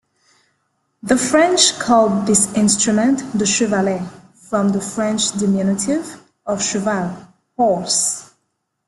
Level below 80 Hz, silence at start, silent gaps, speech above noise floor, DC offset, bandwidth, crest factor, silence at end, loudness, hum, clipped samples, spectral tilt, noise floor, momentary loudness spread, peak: -56 dBFS; 1.05 s; none; 55 dB; under 0.1%; 12.5 kHz; 18 dB; 0.65 s; -17 LUFS; none; under 0.1%; -3.5 dB/octave; -72 dBFS; 13 LU; 0 dBFS